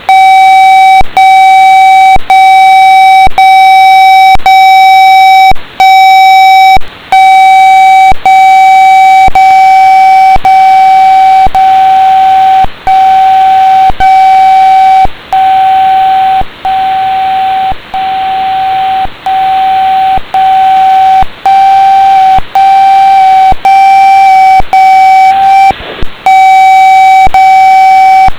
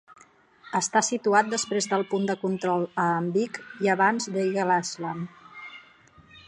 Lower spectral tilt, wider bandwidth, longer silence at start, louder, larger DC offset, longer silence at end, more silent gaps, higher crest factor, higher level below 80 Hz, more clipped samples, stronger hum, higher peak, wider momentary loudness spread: second, -2 dB/octave vs -4 dB/octave; first, 15.5 kHz vs 11 kHz; about the same, 0 s vs 0.1 s; first, -3 LUFS vs -25 LUFS; neither; about the same, 0 s vs 0.05 s; neither; second, 2 dB vs 20 dB; first, -26 dBFS vs -72 dBFS; neither; neither; first, 0 dBFS vs -6 dBFS; second, 7 LU vs 13 LU